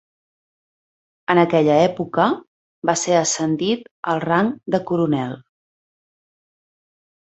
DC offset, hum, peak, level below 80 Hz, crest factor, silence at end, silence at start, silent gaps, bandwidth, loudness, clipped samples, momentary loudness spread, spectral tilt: under 0.1%; none; 0 dBFS; -62 dBFS; 20 dB; 1.9 s; 1.3 s; 2.48-2.82 s, 3.91-4.03 s; 8.2 kHz; -19 LUFS; under 0.1%; 10 LU; -4.5 dB/octave